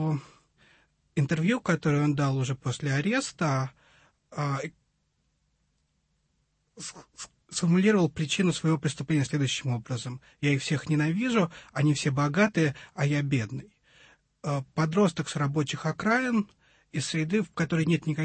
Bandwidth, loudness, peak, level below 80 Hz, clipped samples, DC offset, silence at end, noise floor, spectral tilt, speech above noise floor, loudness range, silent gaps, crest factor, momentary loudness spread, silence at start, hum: 8.8 kHz; -27 LUFS; -10 dBFS; -62 dBFS; under 0.1%; under 0.1%; 0 s; -74 dBFS; -5.5 dB/octave; 47 dB; 8 LU; none; 18 dB; 13 LU; 0 s; none